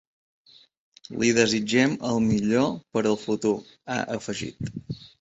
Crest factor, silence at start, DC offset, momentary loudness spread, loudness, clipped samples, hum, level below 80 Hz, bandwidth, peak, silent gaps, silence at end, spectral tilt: 20 dB; 1.1 s; under 0.1%; 13 LU; -25 LUFS; under 0.1%; none; -56 dBFS; 8 kHz; -6 dBFS; none; 0.15 s; -4.5 dB/octave